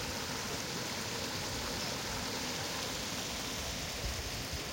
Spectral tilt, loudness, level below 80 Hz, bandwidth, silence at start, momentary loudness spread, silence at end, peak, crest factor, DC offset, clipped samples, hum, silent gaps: -2.5 dB/octave; -37 LUFS; -50 dBFS; 16.5 kHz; 0 s; 1 LU; 0 s; -24 dBFS; 16 dB; under 0.1%; under 0.1%; none; none